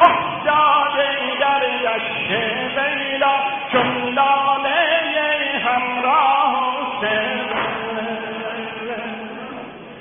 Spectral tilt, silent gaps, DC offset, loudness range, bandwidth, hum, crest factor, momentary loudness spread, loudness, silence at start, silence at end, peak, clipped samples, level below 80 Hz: -7 dB/octave; none; under 0.1%; 4 LU; 3.7 kHz; none; 18 dB; 12 LU; -18 LUFS; 0 s; 0 s; 0 dBFS; under 0.1%; -58 dBFS